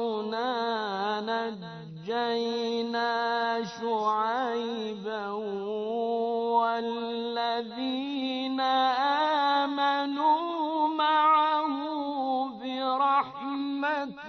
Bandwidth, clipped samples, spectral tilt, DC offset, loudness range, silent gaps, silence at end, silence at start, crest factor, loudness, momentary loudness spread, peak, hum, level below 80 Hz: 6.4 kHz; under 0.1%; -5 dB/octave; under 0.1%; 5 LU; none; 0 s; 0 s; 14 dB; -28 LUFS; 9 LU; -14 dBFS; none; -76 dBFS